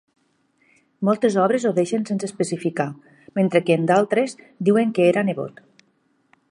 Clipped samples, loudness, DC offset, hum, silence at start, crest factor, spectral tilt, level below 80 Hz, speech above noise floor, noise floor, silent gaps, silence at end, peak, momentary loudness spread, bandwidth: under 0.1%; -21 LUFS; under 0.1%; none; 1 s; 18 dB; -6.5 dB/octave; -72 dBFS; 45 dB; -65 dBFS; none; 1 s; -2 dBFS; 9 LU; 11 kHz